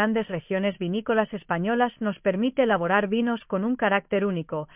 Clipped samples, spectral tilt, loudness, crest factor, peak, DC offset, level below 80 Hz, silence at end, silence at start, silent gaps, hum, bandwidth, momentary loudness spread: under 0.1%; -10 dB/octave; -25 LUFS; 16 dB; -8 dBFS; under 0.1%; -62 dBFS; 0.1 s; 0 s; none; none; 3.8 kHz; 5 LU